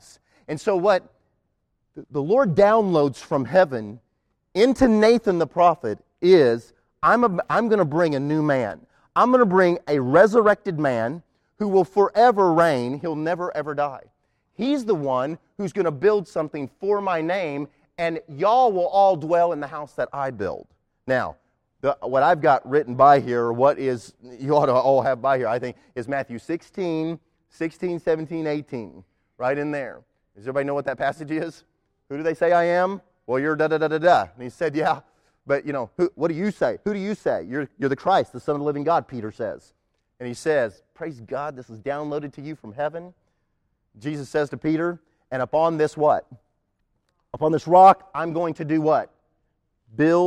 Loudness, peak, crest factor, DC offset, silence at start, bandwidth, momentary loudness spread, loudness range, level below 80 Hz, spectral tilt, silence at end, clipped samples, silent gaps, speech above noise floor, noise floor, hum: -22 LUFS; -2 dBFS; 18 dB; under 0.1%; 0.5 s; 12 kHz; 15 LU; 9 LU; -56 dBFS; -7 dB/octave; 0 s; under 0.1%; none; 51 dB; -72 dBFS; none